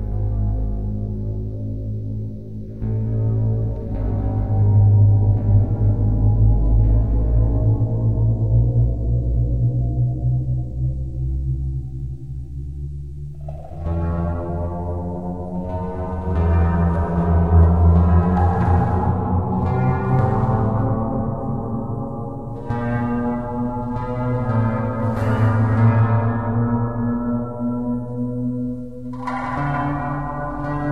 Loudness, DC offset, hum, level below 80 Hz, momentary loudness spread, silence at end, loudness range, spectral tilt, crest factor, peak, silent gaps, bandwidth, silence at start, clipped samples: -21 LUFS; 1%; none; -26 dBFS; 12 LU; 0 s; 9 LU; -11 dB/octave; 16 dB; -4 dBFS; none; 3.3 kHz; 0 s; under 0.1%